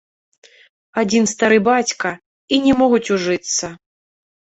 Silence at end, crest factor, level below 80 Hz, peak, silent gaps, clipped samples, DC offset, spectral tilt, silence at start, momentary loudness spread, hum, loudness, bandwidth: 0.85 s; 16 dB; -54 dBFS; -2 dBFS; 2.26-2.48 s; under 0.1%; under 0.1%; -3.5 dB/octave; 0.95 s; 11 LU; none; -17 LUFS; 8.2 kHz